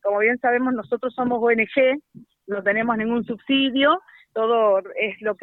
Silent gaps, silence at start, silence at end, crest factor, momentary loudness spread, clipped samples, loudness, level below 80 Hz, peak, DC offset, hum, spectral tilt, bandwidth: none; 0.05 s; 0.1 s; 16 dB; 8 LU; under 0.1%; -21 LUFS; -64 dBFS; -6 dBFS; under 0.1%; none; -7.5 dB/octave; 4.2 kHz